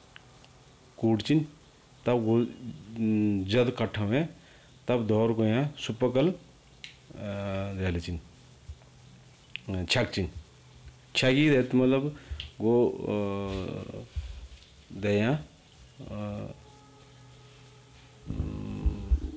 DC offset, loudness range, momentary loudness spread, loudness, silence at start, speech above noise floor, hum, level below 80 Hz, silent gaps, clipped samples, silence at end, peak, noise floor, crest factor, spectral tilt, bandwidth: under 0.1%; 10 LU; 20 LU; -29 LUFS; 1 s; 28 dB; none; -42 dBFS; none; under 0.1%; 0 s; -14 dBFS; -56 dBFS; 16 dB; -6.5 dB/octave; 8 kHz